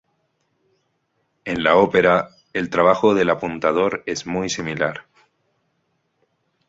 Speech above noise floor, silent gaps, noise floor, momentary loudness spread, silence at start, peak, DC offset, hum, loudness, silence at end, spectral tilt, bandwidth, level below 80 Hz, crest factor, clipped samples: 51 dB; none; -70 dBFS; 12 LU; 1.45 s; -2 dBFS; under 0.1%; none; -19 LUFS; 1.65 s; -5 dB/octave; 7.8 kHz; -54 dBFS; 20 dB; under 0.1%